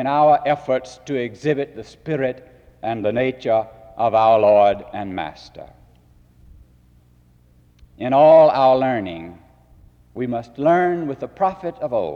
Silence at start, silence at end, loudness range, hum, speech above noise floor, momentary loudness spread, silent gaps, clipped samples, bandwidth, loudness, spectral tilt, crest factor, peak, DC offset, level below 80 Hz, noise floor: 0 s; 0 s; 6 LU; none; 35 dB; 18 LU; none; under 0.1%; 7.2 kHz; -18 LUFS; -7 dB/octave; 16 dB; -4 dBFS; under 0.1%; -54 dBFS; -53 dBFS